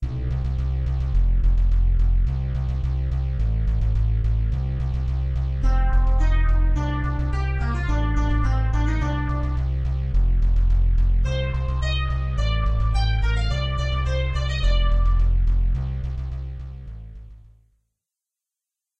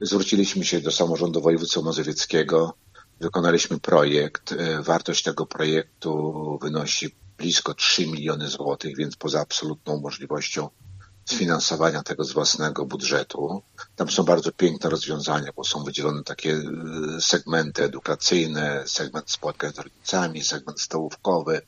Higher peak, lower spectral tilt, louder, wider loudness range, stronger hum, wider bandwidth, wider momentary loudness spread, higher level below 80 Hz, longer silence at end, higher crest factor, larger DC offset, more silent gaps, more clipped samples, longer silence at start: second, -10 dBFS vs -2 dBFS; first, -7 dB/octave vs -3.5 dB/octave; about the same, -24 LUFS vs -24 LUFS; about the same, 2 LU vs 3 LU; neither; second, 7 kHz vs 9 kHz; second, 4 LU vs 10 LU; first, -22 dBFS vs -62 dBFS; first, 1.5 s vs 0.05 s; second, 12 dB vs 22 dB; first, 0.6% vs under 0.1%; neither; neither; about the same, 0 s vs 0 s